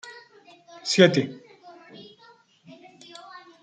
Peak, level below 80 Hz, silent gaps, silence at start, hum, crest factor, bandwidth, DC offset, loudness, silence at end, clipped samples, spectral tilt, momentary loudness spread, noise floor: -2 dBFS; -72 dBFS; none; 0.05 s; none; 26 dB; 9.4 kHz; under 0.1%; -21 LUFS; 0.25 s; under 0.1%; -4.5 dB/octave; 28 LU; -56 dBFS